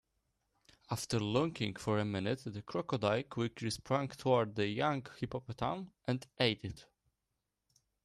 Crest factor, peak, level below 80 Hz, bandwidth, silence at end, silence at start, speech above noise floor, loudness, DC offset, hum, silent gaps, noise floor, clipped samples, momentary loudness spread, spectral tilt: 20 dB; -16 dBFS; -66 dBFS; 13 kHz; 1.2 s; 0.9 s; 51 dB; -36 LUFS; under 0.1%; none; none; -87 dBFS; under 0.1%; 9 LU; -5.5 dB/octave